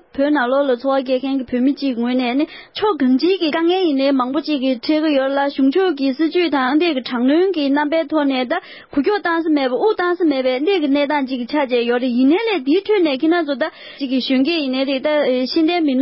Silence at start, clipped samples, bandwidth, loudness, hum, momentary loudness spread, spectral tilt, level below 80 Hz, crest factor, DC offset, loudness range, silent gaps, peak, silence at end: 0.15 s; under 0.1%; 5.8 kHz; -17 LUFS; none; 4 LU; -8.5 dB/octave; -60 dBFS; 12 dB; under 0.1%; 1 LU; none; -6 dBFS; 0 s